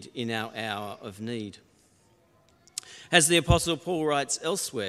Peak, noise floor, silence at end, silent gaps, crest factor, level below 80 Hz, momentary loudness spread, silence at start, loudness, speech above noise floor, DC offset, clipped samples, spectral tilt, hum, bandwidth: -2 dBFS; -63 dBFS; 0 s; none; 26 dB; -44 dBFS; 18 LU; 0 s; -26 LUFS; 36 dB; under 0.1%; under 0.1%; -3.5 dB/octave; none; 15.5 kHz